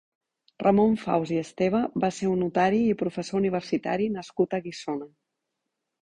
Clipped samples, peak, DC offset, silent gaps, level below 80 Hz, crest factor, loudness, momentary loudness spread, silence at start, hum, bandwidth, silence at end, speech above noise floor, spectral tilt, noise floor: under 0.1%; -8 dBFS; under 0.1%; none; -62 dBFS; 18 dB; -26 LUFS; 8 LU; 0.6 s; none; 9.8 kHz; 0.95 s; 58 dB; -6.5 dB/octave; -83 dBFS